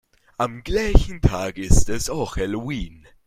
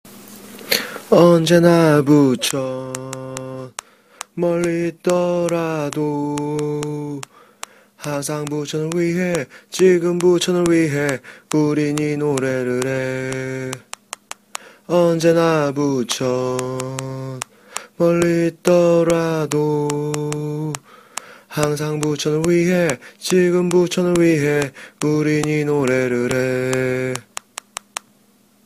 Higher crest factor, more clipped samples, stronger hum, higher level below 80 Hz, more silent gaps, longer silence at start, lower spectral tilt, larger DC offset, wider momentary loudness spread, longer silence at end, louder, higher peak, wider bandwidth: about the same, 20 dB vs 18 dB; neither; neither; first, -24 dBFS vs -54 dBFS; neither; first, 0.4 s vs 0.05 s; about the same, -5.5 dB/octave vs -5.5 dB/octave; neither; second, 10 LU vs 18 LU; second, 0.4 s vs 1.45 s; second, -23 LUFS vs -18 LUFS; about the same, 0 dBFS vs 0 dBFS; about the same, 15 kHz vs 15.5 kHz